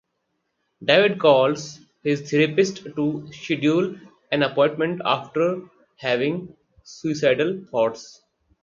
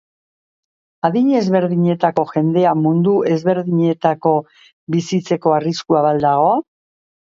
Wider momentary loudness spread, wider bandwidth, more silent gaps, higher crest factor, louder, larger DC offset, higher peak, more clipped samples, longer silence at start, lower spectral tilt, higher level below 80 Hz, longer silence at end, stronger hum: first, 13 LU vs 5 LU; about the same, 7.6 kHz vs 7.6 kHz; second, none vs 4.73-4.87 s; first, 22 dB vs 16 dB; second, -22 LUFS vs -16 LUFS; neither; about the same, 0 dBFS vs 0 dBFS; neither; second, 0.8 s vs 1.05 s; second, -5.5 dB/octave vs -7.5 dB/octave; about the same, -66 dBFS vs -62 dBFS; second, 0.55 s vs 0.75 s; neither